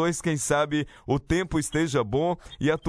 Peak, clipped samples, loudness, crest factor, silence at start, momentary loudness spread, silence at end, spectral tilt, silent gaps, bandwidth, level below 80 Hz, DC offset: -8 dBFS; under 0.1%; -26 LUFS; 18 dB; 0 s; 5 LU; 0 s; -5 dB/octave; none; 11 kHz; -44 dBFS; under 0.1%